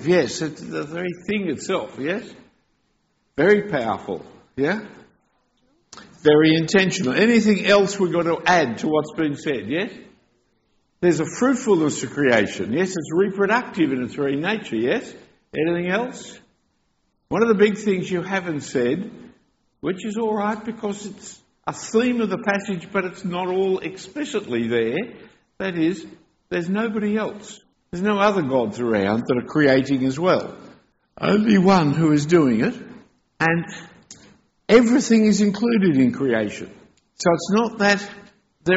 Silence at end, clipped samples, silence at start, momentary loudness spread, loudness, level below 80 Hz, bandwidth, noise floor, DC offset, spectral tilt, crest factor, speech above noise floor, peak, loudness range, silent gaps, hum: 0 s; under 0.1%; 0 s; 14 LU; -21 LUFS; -58 dBFS; 8 kHz; -68 dBFS; under 0.1%; -5 dB/octave; 18 dB; 48 dB; -4 dBFS; 7 LU; none; none